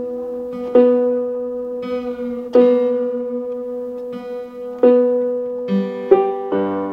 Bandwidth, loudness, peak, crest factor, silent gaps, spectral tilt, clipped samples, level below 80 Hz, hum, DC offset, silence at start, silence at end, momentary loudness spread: 5.4 kHz; -18 LUFS; 0 dBFS; 18 dB; none; -9 dB/octave; under 0.1%; -58 dBFS; none; under 0.1%; 0 s; 0 s; 14 LU